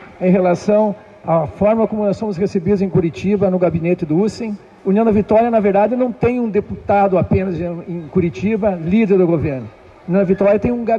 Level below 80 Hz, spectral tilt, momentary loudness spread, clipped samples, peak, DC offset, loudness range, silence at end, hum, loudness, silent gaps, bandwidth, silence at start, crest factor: -42 dBFS; -9 dB/octave; 9 LU; under 0.1%; -4 dBFS; under 0.1%; 2 LU; 0 s; none; -16 LUFS; none; 7.8 kHz; 0 s; 12 dB